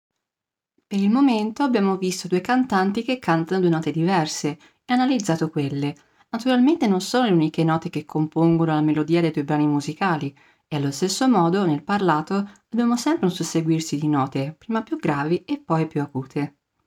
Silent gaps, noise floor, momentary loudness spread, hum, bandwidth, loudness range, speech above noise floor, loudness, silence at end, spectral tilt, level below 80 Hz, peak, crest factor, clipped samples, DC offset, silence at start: none; -88 dBFS; 9 LU; none; 16 kHz; 3 LU; 67 dB; -22 LUFS; 0.35 s; -6 dB/octave; -64 dBFS; -6 dBFS; 14 dB; under 0.1%; under 0.1%; 0.9 s